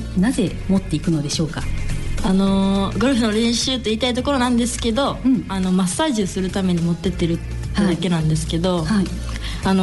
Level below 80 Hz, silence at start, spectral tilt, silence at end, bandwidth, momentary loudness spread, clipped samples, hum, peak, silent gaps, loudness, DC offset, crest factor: -30 dBFS; 0 s; -5.5 dB/octave; 0 s; 12 kHz; 7 LU; under 0.1%; none; -6 dBFS; none; -20 LUFS; under 0.1%; 12 dB